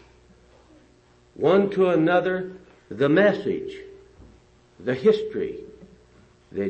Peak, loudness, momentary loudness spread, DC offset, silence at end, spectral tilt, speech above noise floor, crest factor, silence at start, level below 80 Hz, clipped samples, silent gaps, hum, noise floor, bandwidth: -8 dBFS; -22 LUFS; 18 LU; under 0.1%; 0 s; -7.5 dB/octave; 35 dB; 16 dB; 1.4 s; -58 dBFS; under 0.1%; none; none; -57 dBFS; 8.2 kHz